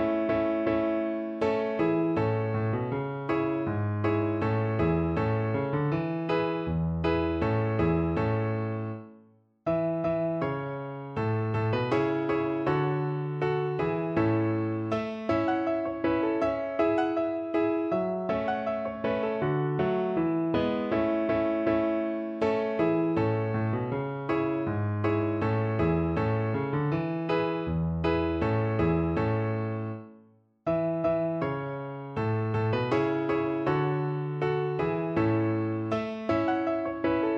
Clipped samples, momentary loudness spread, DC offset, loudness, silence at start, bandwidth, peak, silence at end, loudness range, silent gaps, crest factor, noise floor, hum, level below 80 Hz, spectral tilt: under 0.1%; 5 LU; under 0.1%; -28 LUFS; 0 s; 6.4 kHz; -12 dBFS; 0 s; 2 LU; none; 14 dB; -59 dBFS; none; -50 dBFS; -9.5 dB/octave